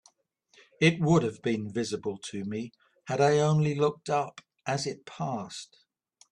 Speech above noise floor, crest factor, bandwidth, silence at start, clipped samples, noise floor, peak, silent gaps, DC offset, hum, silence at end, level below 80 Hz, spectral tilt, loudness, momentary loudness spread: 40 dB; 20 dB; 10.5 kHz; 0.8 s; under 0.1%; -68 dBFS; -10 dBFS; none; under 0.1%; none; 0.7 s; -66 dBFS; -6 dB/octave; -29 LUFS; 16 LU